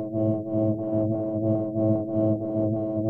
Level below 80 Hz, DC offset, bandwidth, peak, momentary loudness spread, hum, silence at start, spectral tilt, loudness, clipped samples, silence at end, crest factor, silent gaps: -58 dBFS; under 0.1%; 1.7 kHz; -12 dBFS; 2 LU; none; 0 s; -13.5 dB/octave; -26 LUFS; under 0.1%; 0 s; 12 dB; none